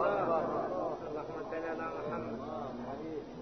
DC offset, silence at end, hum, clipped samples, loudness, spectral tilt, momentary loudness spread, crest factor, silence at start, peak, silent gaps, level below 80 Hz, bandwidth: under 0.1%; 0 s; none; under 0.1%; -37 LUFS; -5.5 dB/octave; 9 LU; 16 dB; 0 s; -20 dBFS; none; -62 dBFS; 6.2 kHz